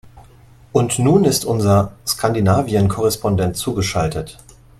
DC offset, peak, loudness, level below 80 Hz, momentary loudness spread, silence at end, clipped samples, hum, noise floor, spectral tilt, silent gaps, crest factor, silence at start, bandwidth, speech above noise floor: under 0.1%; 0 dBFS; -17 LUFS; -42 dBFS; 7 LU; 0.45 s; under 0.1%; none; -46 dBFS; -5.5 dB/octave; none; 16 dB; 0.15 s; 15 kHz; 29 dB